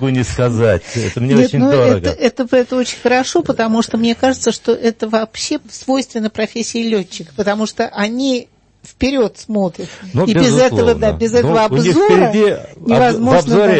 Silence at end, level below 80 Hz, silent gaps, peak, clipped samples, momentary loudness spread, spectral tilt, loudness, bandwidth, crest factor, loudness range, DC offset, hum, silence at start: 0 s; -40 dBFS; none; 0 dBFS; under 0.1%; 9 LU; -5.5 dB/octave; -14 LUFS; 8.8 kHz; 14 dB; 6 LU; under 0.1%; none; 0 s